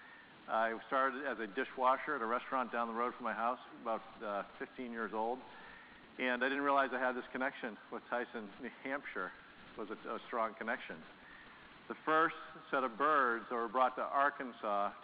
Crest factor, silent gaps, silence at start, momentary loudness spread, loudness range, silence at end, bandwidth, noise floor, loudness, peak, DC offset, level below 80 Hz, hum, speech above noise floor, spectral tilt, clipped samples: 20 dB; none; 0 s; 19 LU; 8 LU; 0 s; 5 kHz; -57 dBFS; -37 LUFS; -18 dBFS; under 0.1%; -76 dBFS; none; 20 dB; -1.5 dB/octave; under 0.1%